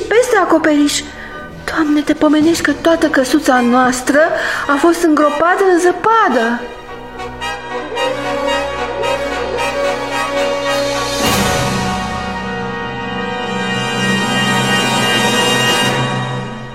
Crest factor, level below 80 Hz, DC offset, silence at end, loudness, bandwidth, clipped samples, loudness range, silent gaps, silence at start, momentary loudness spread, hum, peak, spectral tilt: 14 dB; -38 dBFS; 0.9%; 0 s; -14 LUFS; 16.5 kHz; under 0.1%; 5 LU; none; 0 s; 10 LU; none; 0 dBFS; -4 dB/octave